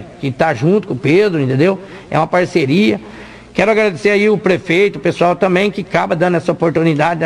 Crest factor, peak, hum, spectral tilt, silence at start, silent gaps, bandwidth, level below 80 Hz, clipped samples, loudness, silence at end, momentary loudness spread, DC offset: 12 dB; 0 dBFS; none; -7 dB/octave; 0 s; none; 11.5 kHz; -48 dBFS; under 0.1%; -14 LUFS; 0 s; 6 LU; under 0.1%